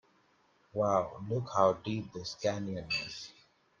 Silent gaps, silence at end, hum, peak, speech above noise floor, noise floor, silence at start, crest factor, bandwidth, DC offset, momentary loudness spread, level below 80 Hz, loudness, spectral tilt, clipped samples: none; 0.5 s; none; -12 dBFS; 36 dB; -69 dBFS; 0.75 s; 22 dB; 9.2 kHz; under 0.1%; 13 LU; -68 dBFS; -33 LUFS; -5.5 dB/octave; under 0.1%